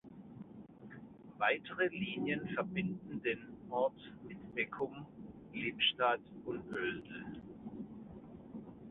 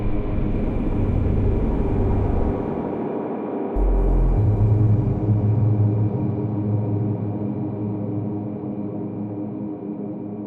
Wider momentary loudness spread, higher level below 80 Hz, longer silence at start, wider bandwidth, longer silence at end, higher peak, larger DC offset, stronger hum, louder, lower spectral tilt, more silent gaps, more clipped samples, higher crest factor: first, 19 LU vs 10 LU; second, -70 dBFS vs -26 dBFS; about the same, 0.05 s vs 0 s; first, 4 kHz vs 3.5 kHz; about the same, 0 s vs 0 s; second, -18 dBFS vs -8 dBFS; neither; neither; second, -38 LUFS vs -23 LUFS; second, -2.5 dB/octave vs -12 dB/octave; neither; neither; first, 22 dB vs 14 dB